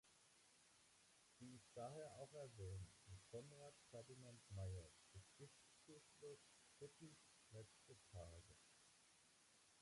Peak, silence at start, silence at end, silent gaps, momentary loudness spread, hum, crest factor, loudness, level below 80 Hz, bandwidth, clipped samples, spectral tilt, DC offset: -44 dBFS; 0.05 s; 0 s; none; 11 LU; none; 18 dB; -61 LUFS; -72 dBFS; 11.5 kHz; under 0.1%; -5 dB/octave; under 0.1%